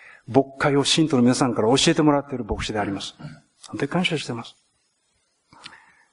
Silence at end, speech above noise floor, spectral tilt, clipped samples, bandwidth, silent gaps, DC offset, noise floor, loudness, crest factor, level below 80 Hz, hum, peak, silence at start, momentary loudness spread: 0.45 s; 48 dB; -4.5 dB/octave; under 0.1%; 10.5 kHz; none; under 0.1%; -69 dBFS; -21 LUFS; 22 dB; -48 dBFS; none; -2 dBFS; 0.3 s; 17 LU